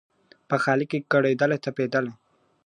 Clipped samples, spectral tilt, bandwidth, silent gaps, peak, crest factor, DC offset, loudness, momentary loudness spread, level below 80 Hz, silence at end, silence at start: under 0.1%; -7 dB/octave; 11 kHz; none; -6 dBFS; 18 dB; under 0.1%; -24 LUFS; 6 LU; -74 dBFS; 0.55 s; 0.5 s